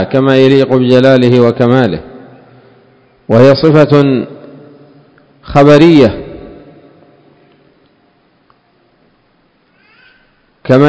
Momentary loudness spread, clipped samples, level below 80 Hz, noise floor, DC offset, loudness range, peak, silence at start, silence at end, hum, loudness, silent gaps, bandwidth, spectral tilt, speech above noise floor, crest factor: 19 LU; 3%; -40 dBFS; -53 dBFS; under 0.1%; 3 LU; 0 dBFS; 0 s; 0 s; none; -8 LUFS; none; 8 kHz; -8 dB/octave; 46 dB; 10 dB